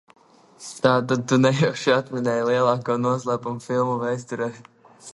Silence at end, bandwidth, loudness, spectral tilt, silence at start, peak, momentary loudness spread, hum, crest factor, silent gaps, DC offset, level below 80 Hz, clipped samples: 0 s; 11.5 kHz; -22 LUFS; -6 dB/octave; 0.6 s; -4 dBFS; 10 LU; none; 18 dB; none; under 0.1%; -66 dBFS; under 0.1%